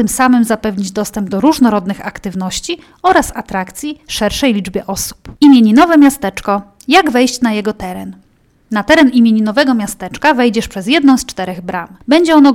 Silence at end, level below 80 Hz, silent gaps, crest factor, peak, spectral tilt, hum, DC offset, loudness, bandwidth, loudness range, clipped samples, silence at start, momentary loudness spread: 0 s; -40 dBFS; none; 12 dB; 0 dBFS; -4.5 dB/octave; none; under 0.1%; -12 LUFS; 16.5 kHz; 5 LU; under 0.1%; 0 s; 14 LU